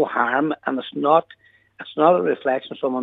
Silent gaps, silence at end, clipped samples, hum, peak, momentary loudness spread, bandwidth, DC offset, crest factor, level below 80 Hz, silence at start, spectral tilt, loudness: none; 0 s; under 0.1%; none; -2 dBFS; 9 LU; 4.1 kHz; under 0.1%; 20 dB; -76 dBFS; 0 s; -8 dB/octave; -20 LUFS